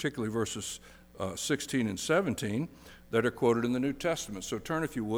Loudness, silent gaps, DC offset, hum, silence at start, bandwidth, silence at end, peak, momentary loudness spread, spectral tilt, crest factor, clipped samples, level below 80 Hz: -32 LUFS; none; under 0.1%; none; 0 s; over 20 kHz; 0 s; -14 dBFS; 10 LU; -4.5 dB/octave; 18 dB; under 0.1%; -58 dBFS